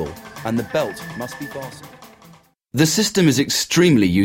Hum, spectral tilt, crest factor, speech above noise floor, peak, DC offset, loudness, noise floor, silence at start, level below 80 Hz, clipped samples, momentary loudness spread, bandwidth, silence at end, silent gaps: none; -4.5 dB/octave; 18 dB; 31 dB; -2 dBFS; under 0.1%; -18 LUFS; -49 dBFS; 0 s; -50 dBFS; under 0.1%; 16 LU; 16.5 kHz; 0 s; none